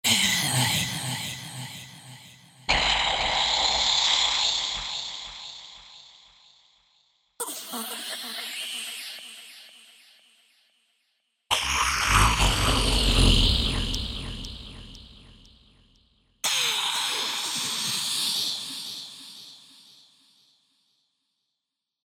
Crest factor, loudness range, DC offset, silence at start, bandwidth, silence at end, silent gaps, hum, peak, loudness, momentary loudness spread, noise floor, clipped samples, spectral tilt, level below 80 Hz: 22 dB; 13 LU; under 0.1%; 0.05 s; 17.5 kHz; 2.45 s; none; none; -6 dBFS; -24 LUFS; 22 LU; -85 dBFS; under 0.1%; -2 dB/octave; -36 dBFS